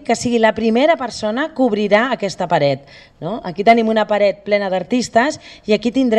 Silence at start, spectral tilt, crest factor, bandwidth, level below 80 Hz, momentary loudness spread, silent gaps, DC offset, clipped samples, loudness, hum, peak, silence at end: 0 s; -5 dB/octave; 16 dB; 10.5 kHz; -52 dBFS; 9 LU; none; under 0.1%; under 0.1%; -16 LUFS; none; 0 dBFS; 0 s